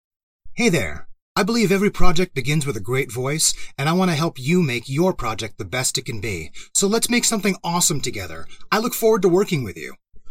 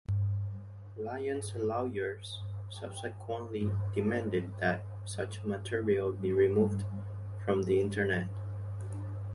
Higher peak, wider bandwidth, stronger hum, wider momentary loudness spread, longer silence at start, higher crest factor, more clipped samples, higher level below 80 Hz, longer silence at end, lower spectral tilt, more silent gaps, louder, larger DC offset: first, 0 dBFS vs -16 dBFS; first, 16.5 kHz vs 11.5 kHz; neither; about the same, 12 LU vs 12 LU; first, 0.45 s vs 0.1 s; about the same, 18 dB vs 16 dB; neither; first, -34 dBFS vs -52 dBFS; about the same, 0 s vs 0 s; second, -4 dB/octave vs -7 dB/octave; first, 1.22-1.35 s vs none; first, -20 LUFS vs -34 LUFS; neither